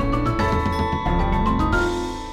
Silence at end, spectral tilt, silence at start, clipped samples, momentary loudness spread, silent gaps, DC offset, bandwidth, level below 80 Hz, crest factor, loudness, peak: 0 s; -6.5 dB/octave; 0 s; under 0.1%; 3 LU; none; under 0.1%; 13 kHz; -26 dBFS; 12 dB; -22 LUFS; -8 dBFS